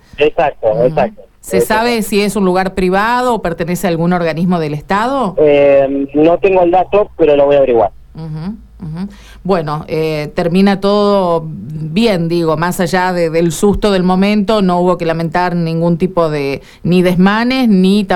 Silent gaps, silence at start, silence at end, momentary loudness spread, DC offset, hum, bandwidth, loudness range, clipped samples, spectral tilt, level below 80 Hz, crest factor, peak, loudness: none; 0.15 s; 0 s; 10 LU; under 0.1%; none; 17.5 kHz; 4 LU; under 0.1%; -6.5 dB/octave; -36 dBFS; 12 dB; 0 dBFS; -12 LUFS